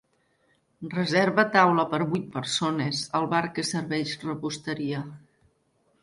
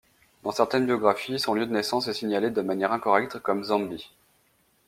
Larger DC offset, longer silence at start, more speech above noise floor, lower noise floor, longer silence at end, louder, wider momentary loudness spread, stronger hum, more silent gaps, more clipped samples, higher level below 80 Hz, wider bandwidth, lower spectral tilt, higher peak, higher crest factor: neither; first, 0.8 s vs 0.45 s; about the same, 43 dB vs 40 dB; about the same, -68 dBFS vs -66 dBFS; about the same, 0.85 s vs 0.8 s; about the same, -26 LUFS vs -26 LUFS; first, 11 LU vs 6 LU; neither; neither; neither; about the same, -66 dBFS vs -68 dBFS; second, 11.5 kHz vs 16 kHz; about the same, -4.5 dB/octave vs -4.5 dB/octave; about the same, -4 dBFS vs -4 dBFS; about the same, 22 dB vs 22 dB